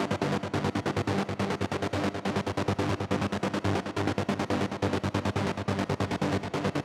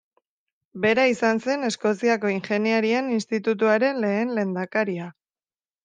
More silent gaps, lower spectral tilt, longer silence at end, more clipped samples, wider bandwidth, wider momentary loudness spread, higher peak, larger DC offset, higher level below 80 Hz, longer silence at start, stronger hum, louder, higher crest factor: neither; about the same, -6 dB/octave vs -5.5 dB/octave; second, 0 s vs 0.75 s; neither; first, 14 kHz vs 9.6 kHz; second, 1 LU vs 6 LU; second, -12 dBFS vs -6 dBFS; neither; first, -54 dBFS vs -72 dBFS; second, 0 s vs 0.75 s; neither; second, -30 LUFS vs -23 LUFS; about the same, 16 dB vs 16 dB